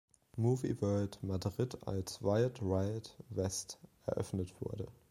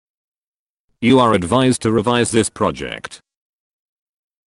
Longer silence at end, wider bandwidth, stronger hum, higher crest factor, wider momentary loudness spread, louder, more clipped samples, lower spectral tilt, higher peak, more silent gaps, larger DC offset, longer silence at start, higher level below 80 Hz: second, 0.2 s vs 1.3 s; first, 16 kHz vs 12 kHz; neither; about the same, 18 dB vs 16 dB; second, 10 LU vs 14 LU; second, -38 LUFS vs -16 LUFS; neither; first, -6.5 dB/octave vs -5 dB/octave; second, -18 dBFS vs -2 dBFS; neither; neither; second, 0.35 s vs 1 s; second, -62 dBFS vs -50 dBFS